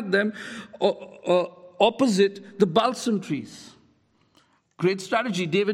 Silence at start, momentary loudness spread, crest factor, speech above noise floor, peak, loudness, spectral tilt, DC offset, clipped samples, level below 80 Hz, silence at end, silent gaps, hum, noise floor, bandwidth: 0 s; 13 LU; 20 dB; 40 dB; -4 dBFS; -24 LUFS; -5 dB/octave; under 0.1%; under 0.1%; -72 dBFS; 0 s; none; none; -64 dBFS; 14 kHz